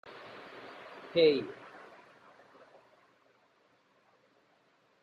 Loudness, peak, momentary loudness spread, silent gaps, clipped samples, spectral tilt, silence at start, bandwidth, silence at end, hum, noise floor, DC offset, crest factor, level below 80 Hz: -29 LUFS; -14 dBFS; 27 LU; none; under 0.1%; -6.5 dB/octave; 0.05 s; 6 kHz; 3.5 s; none; -69 dBFS; under 0.1%; 22 dB; -78 dBFS